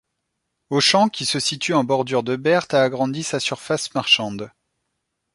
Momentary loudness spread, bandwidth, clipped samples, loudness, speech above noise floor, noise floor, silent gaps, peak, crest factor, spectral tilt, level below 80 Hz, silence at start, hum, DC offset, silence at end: 8 LU; 11.5 kHz; under 0.1%; -20 LUFS; 56 dB; -77 dBFS; none; -2 dBFS; 20 dB; -3.5 dB/octave; -64 dBFS; 0.7 s; none; under 0.1%; 0.85 s